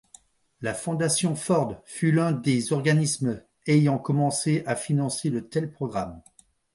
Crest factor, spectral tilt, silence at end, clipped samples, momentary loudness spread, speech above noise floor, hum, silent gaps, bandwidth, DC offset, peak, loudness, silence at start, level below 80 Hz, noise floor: 18 dB; -5.5 dB/octave; 0.55 s; under 0.1%; 9 LU; 32 dB; none; none; 11.5 kHz; under 0.1%; -8 dBFS; -25 LUFS; 0.6 s; -60 dBFS; -56 dBFS